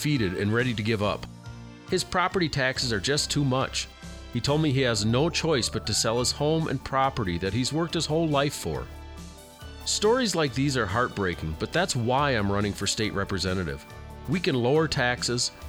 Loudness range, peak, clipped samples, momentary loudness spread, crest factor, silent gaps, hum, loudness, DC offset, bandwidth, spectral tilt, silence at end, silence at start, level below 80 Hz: 2 LU; -10 dBFS; under 0.1%; 13 LU; 18 dB; none; none; -26 LUFS; under 0.1%; 20 kHz; -4.5 dB/octave; 0 s; 0 s; -44 dBFS